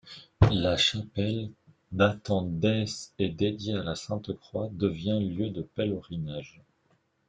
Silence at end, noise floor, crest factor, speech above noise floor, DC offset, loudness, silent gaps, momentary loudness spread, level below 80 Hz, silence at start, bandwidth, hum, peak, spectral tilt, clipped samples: 0.8 s; -70 dBFS; 22 dB; 41 dB; under 0.1%; -29 LUFS; none; 12 LU; -48 dBFS; 0.05 s; 9.2 kHz; none; -6 dBFS; -6 dB/octave; under 0.1%